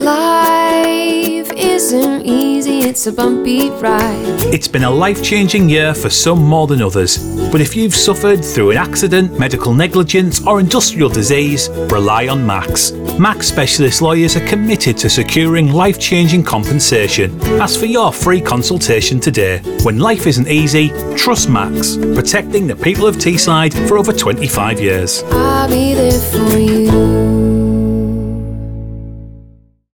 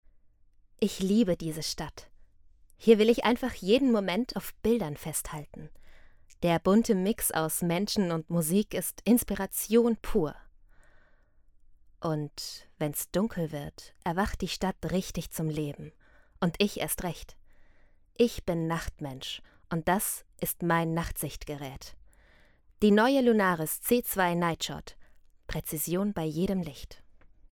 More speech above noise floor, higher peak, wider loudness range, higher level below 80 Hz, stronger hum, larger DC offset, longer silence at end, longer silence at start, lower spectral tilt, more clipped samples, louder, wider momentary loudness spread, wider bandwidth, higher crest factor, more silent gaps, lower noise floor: about the same, 31 dB vs 31 dB; first, -2 dBFS vs -6 dBFS; second, 2 LU vs 6 LU; first, -30 dBFS vs -50 dBFS; neither; neither; first, 0.55 s vs 0.4 s; second, 0 s vs 0.8 s; about the same, -4.5 dB/octave vs -5 dB/octave; neither; first, -12 LUFS vs -29 LUFS; second, 4 LU vs 15 LU; about the same, over 20 kHz vs 20 kHz; second, 10 dB vs 22 dB; neither; second, -42 dBFS vs -60 dBFS